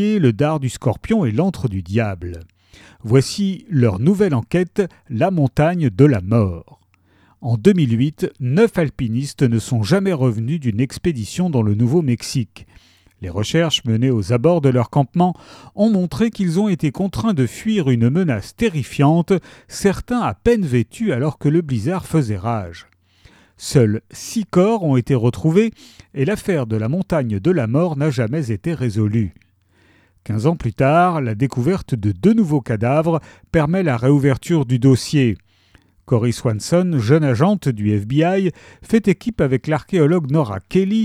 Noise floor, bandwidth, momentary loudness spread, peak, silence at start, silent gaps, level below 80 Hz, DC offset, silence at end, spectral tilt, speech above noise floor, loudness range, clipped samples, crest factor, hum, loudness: -56 dBFS; 14.5 kHz; 7 LU; 0 dBFS; 0 s; none; -44 dBFS; under 0.1%; 0 s; -7 dB/octave; 39 dB; 3 LU; under 0.1%; 18 dB; none; -18 LUFS